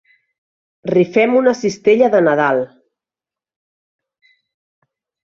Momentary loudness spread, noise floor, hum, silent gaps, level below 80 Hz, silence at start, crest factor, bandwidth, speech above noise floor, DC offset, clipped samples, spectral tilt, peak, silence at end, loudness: 8 LU; -89 dBFS; none; none; -62 dBFS; 0.85 s; 16 dB; 7.6 kHz; 76 dB; under 0.1%; under 0.1%; -6 dB/octave; -2 dBFS; 2.55 s; -14 LUFS